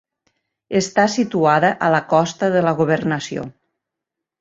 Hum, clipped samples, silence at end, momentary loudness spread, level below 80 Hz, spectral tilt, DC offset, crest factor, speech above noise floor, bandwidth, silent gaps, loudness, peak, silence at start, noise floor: none; under 0.1%; 0.9 s; 9 LU; -60 dBFS; -5.5 dB/octave; under 0.1%; 18 dB; 66 dB; 8 kHz; none; -18 LUFS; -2 dBFS; 0.7 s; -83 dBFS